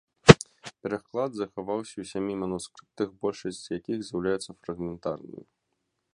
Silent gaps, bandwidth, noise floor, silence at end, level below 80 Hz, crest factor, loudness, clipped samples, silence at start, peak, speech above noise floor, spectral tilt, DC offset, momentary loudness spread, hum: none; 11.5 kHz; -79 dBFS; 0.8 s; -50 dBFS; 28 dB; -27 LUFS; under 0.1%; 0.25 s; 0 dBFS; 47 dB; -5.5 dB/octave; under 0.1%; 20 LU; none